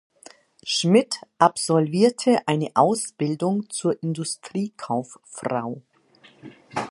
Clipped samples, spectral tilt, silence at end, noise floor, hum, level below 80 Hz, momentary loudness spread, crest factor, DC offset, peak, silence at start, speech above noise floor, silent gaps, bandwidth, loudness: under 0.1%; -5 dB/octave; 0 s; -55 dBFS; none; -70 dBFS; 14 LU; 22 dB; under 0.1%; -2 dBFS; 0.65 s; 32 dB; none; 11.5 kHz; -23 LUFS